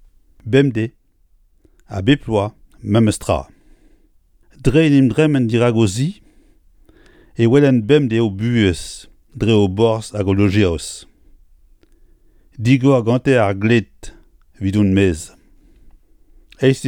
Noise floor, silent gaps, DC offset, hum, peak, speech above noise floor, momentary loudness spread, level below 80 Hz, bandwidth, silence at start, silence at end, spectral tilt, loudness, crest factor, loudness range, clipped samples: -55 dBFS; none; under 0.1%; none; 0 dBFS; 40 dB; 14 LU; -40 dBFS; 13 kHz; 0.45 s; 0 s; -6.5 dB/octave; -16 LUFS; 18 dB; 4 LU; under 0.1%